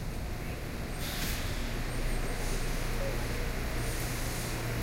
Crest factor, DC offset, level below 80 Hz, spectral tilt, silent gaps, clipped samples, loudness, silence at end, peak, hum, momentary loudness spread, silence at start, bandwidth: 12 dB; under 0.1%; -36 dBFS; -4 dB/octave; none; under 0.1%; -35 LUFS; 0 s; -22 dBFS; none; 4 LU; 0 s; 16 kHz